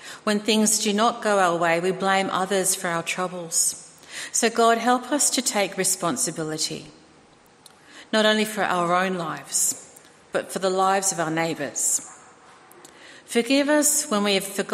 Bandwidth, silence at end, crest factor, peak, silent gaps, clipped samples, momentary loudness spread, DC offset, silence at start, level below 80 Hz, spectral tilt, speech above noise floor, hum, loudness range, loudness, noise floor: 15.5 kHz; 0 s; 18 dB; -6 dBFS; none; under 0.1%; 8 LU; under 0.1%; 0 s; -72 dBFS; -2.5 dB/octave; 31 dB; none; 3 LU; -22 LUFS; -54 dBFS